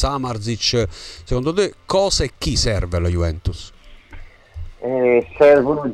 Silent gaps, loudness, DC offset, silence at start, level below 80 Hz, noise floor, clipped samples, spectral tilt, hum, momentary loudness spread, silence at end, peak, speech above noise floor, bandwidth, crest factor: none; -18 LUFS; under 0.1%; 0 s; -30 dBFS; -38 dBFS; under 0.1%; -5 dB/octave; none; 15 LU; 0 s; -4 dBFS; 20 dB; 13 kHz; 16 dB